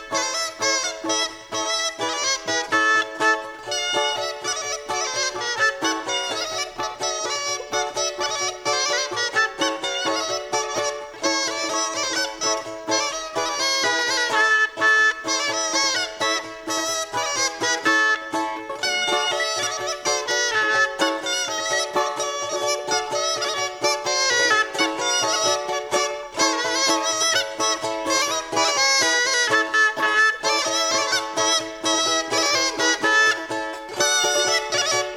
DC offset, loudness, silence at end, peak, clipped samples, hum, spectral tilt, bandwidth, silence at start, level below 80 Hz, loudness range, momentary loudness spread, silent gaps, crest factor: under 0.1%; -21 LUFS; 0 s; -6 dBFS; under 0.1%; none; 0 dB/octave; 18.5 kHz; 0 s; -60 dBFS; 5 LU; 7 LU; none; 16 dB